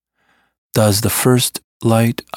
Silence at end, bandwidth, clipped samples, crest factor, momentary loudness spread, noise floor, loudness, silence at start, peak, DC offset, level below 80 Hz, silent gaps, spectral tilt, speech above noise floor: 0 s; 18 kHz; under 0.1%; 16 dB; 7 LU; -61 dBFS; -15 LUFS; 0.75 s; 0 dBFS; under 0.1%; -50 dBFS; 1.64-1.80 s; -5 dB/octave; 47 dB